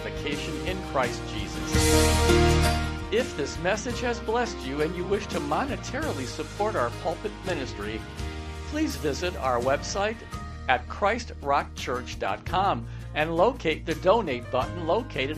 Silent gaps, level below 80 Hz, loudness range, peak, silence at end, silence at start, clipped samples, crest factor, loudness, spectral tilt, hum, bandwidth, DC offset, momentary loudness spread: none; -36 dBFS; 6 LU; -4 dBFS; 0 s; 0 s; under 0.1%; 22 dB; -27 LUFS; -4.5 dB/octave; none; 15.5 kHz; under 0.1%; 11 LU